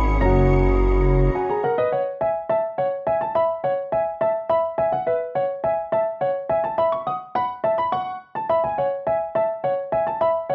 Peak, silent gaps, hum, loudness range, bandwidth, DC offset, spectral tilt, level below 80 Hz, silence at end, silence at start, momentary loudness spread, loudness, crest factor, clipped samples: -6 dBFS; none; none; 2 LU; 4.9 kHz; under 0.1%; -9.5 dB/octave; -28 dBFS; 0 s; 0 s; 6 LU; -22 LUFS; 16 dB; under 0.1%